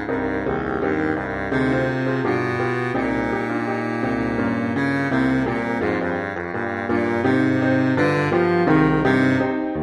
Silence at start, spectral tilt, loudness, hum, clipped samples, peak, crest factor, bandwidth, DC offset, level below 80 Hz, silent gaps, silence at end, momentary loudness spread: 0 s; -7.5 dB/octave; -21 LUFS; none; under 0.1%; -6 dBFS; 16 dB; 10.5 kHz; under 0.1%; -44 dBFS; none; 0 s; 6 LU